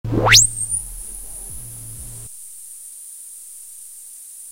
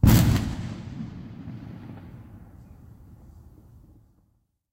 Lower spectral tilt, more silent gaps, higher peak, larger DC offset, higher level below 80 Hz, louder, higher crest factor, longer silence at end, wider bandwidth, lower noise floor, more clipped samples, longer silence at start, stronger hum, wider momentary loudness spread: second, -1.5 dB/octave vs -6 dB/octave; neither; first, 0 dBFS vs -6 dBFS; neither; about the same, -40 dBFS vs -36 dBFS; first, -13 LUFS vs -27 LUFS; about the same, 22 dB vs 22 dB; second, 0 s vs 2.35 s; about the same, 16 kHz vs 16 kHz; second, -39 dBFS vs -69 dBFS; neither; about the same, 0.05 s vs 0.05 s; neither; second, 25 LU vs 28 LU